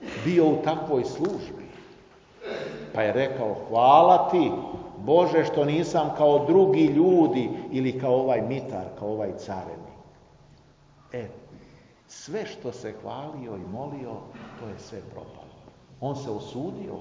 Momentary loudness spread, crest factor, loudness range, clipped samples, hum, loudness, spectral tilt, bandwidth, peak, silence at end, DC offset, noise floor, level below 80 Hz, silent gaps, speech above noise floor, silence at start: 21 LU; 22 dB; 17 LU; under 0.1%; none; -24 LUFS; -7 dB/octave; 7.6 kHz; -4 dBFS; 0 s; under 0.1%; -56 dBFS; -60 dBFS; none; 32 dB; 0 s